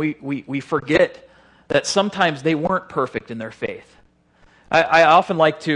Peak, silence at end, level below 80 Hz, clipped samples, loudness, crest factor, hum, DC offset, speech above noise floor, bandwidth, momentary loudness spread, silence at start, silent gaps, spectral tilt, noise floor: 0 dBFS; 0 s; -54 dBFS; under 0.1%; -19 LUFS; 18 dB; none; under 0.1%; 36 dB; 11 kHz; 15 LU; 0 s; none; -4.5 dB/octave; -55 dBFS